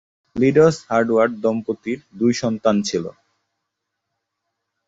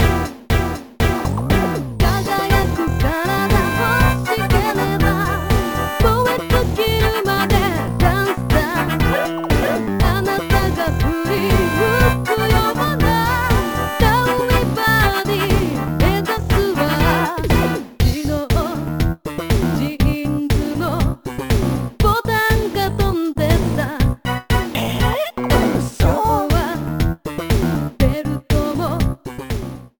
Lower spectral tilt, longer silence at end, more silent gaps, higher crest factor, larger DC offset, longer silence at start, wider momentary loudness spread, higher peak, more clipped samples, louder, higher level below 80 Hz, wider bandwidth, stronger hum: about the same, -6 dB/octave vs -6 dB/octave; first, 1.8 s vs 0.15 s; neither; about the same, 18 dB vs 16 dB; second, under 0.1% vs 0.4%; first, 0.35 s vs 0 s; first, 12 LU vs 5 LU; about the same, -2 dBFS vs 0 dBFS; neither; about the same, -19 LUFS vs -18 LUFS; second, -56 dBFS vs -24 dBFS; second, 8 kHz vs over 20 kHz; neither